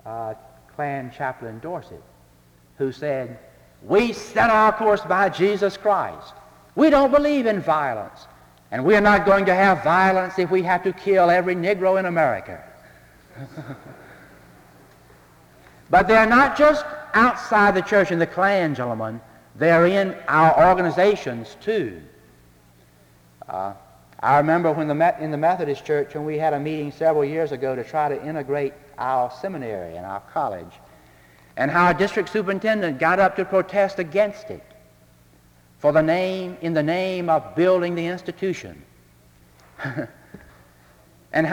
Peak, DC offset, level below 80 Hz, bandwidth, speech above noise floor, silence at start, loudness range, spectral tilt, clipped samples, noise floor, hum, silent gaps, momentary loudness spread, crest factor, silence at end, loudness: -2 dBFS; under 0.1%; -52 dBFS; 19.5 kHz; 34 dB; 0.05 s; 9 LU; -6.5 dB/octave; under 0.1%; -54 dBFS; none; none; 17 LU; 18 dB; 0 s; -20 LUFS